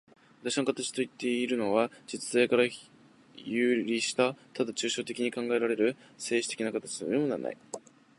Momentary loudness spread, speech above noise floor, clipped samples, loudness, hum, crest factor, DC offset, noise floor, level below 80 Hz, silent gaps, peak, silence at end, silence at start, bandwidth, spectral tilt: 11 LU; 24 dB; under 0.1%; -30 LUFS; none; 20 dB; under 0.1%; -54 dBFS; -80 dBFS; none; -10 dBFS; 0.4 s; 0.45 s; 11.5 kHz; -3.5 dB/octave